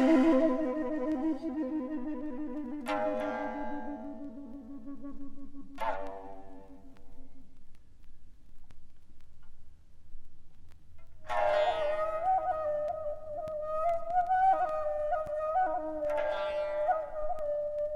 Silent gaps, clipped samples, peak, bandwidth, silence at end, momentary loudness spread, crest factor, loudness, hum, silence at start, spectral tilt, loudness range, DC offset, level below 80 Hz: none; under 0.1%; -14 dBFS; 11.5 kHz; 0 s; 19 LU; 18 dB; -32 LUFS; none; 0 s; -6 dB/octave; 13 LU; under 0.1%; -52 dBFS